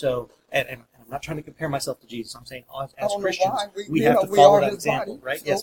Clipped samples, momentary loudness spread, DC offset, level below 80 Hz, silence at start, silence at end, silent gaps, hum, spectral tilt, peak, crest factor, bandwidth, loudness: under 0.1%; 20 LU; under 0.1%; -58 dBFS; 0 s; 0 s; none; none; -4.5 dB/octave; 0 dBFS; 22 dB; 17 kHz; -22 LUFS